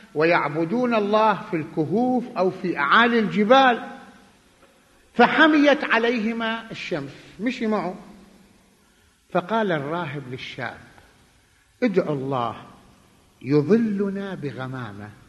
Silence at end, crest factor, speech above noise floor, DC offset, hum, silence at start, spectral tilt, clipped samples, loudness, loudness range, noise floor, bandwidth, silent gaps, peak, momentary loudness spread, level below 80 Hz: 0.15 s; 20 dB; 37 dB; under 0.1%; none; 0.15 s; -6.5 dB/octave; under 0.1%; -22 LUFS; 10 LU; -59 dBFS; 12 kHz; none; -2 dBFS; 17 LU; -62 dBFS